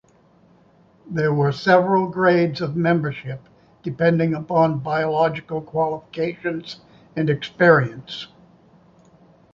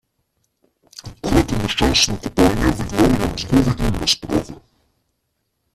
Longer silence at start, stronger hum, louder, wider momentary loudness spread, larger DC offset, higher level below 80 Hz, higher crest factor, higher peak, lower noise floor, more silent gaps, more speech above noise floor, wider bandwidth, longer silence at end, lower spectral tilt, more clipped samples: about the same, 1.05 s vs 1.05 s; neither; about the same, -20 LUFS vs -18 LUFS; first, 17 LU vs 9 LU; neither; second, -58 dBFS vs -30 dBFS; about the same, 20 dB vs 18 dB; about the same, -2 dBFS vs -2 dBFS; second, -55 dBFS vs -72 dBFS; neither; second, 35 dB vs 54 dB; second, 7.2 kHz vs 14.5 kHz; about the same, 1.3 s vs 1.2 s; first, -8 dB/octave vs -4.5 dB/octave; neither